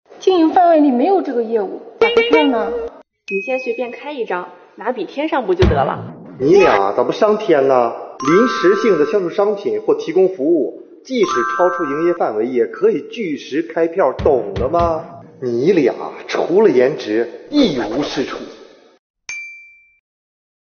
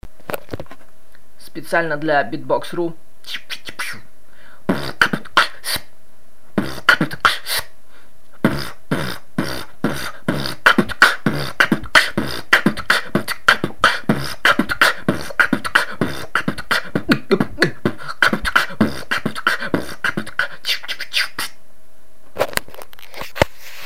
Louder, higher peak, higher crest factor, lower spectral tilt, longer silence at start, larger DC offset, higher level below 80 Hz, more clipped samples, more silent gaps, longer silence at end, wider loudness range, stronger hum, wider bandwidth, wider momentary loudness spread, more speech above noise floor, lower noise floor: first, -16 LUFS vs -19 LUFS; about the same, 0 dBFS vs 0 dBFS; about the same, 16 dB vs 20 dB; about the same, -4.5 dB/octave vs -4 dB/octave; about the same, 0.1 s vs 0 s; second, under 0.1% vs 5%; first, -38 dBFS vs -44 dBFS; neither; first, 18.99-19.14 s vs none; first, 1 s vs 0 s; about the same, 5 LU vs 7 LU; neither; second, 6.8 kHz vs 16 kHz; about the same, 13 LU vs 14 LU; second, 26 dB vs 34 dB; second, -42 dBFS vs -54 dBFS